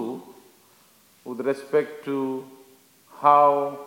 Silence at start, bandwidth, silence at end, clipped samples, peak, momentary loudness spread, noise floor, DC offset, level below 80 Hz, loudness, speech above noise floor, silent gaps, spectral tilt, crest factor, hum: 0 s; 17 kHz; 0 s; under 0.1%; -2 dBFS; 20 LU; -57 dBFS; under 0.1%; -86 dBFS; -22 LUFS; 36 dB; none; -6.5 dB/octave; 22 dB; none